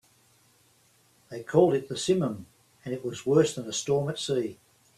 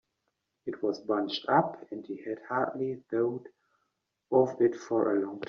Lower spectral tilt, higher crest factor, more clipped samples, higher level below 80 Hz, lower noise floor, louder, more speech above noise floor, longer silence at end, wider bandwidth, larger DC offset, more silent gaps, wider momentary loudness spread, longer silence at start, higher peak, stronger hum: about the same, -5.5 dB/octave vs -4.5 dB/octave; about the same, 20 dB vs 20 dB; neither; first, -66 dBFS vs -76 dBFS; second, -63 dBFS vs -81 dBFS; first, -27 LUFS vs -30 LUFS; second, 37 dB vs 52 dB; first, 0.45 s vs 0 s; first, 14 kHz vs 7 kHz; neither; neither; first, 17 LU vs 13 LU; first, 1.3 s vs 0.65 s; about the same, -8 dBFS vs -10 dBFS; neither